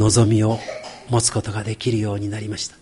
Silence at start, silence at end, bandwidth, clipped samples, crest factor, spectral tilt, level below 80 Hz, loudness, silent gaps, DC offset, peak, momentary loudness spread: 0 s; 0.1 s; 11.5 kHz; under 0.1%; 16 dB; -5 dB/octave; -44 dBFS; -21 LUFS; none; under 0.1%; -4 dBFS; 11 LU